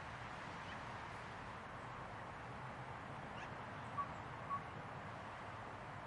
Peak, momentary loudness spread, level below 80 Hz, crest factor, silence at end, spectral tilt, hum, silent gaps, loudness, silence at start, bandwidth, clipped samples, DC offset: -32 dBFS; 4 LU; -68 dBFS; 18 dB; 0 s; -5.5 dB/octave; none; none; -49 LUFS; 0 s; 11 kHz; under 0.1%; under 0.1%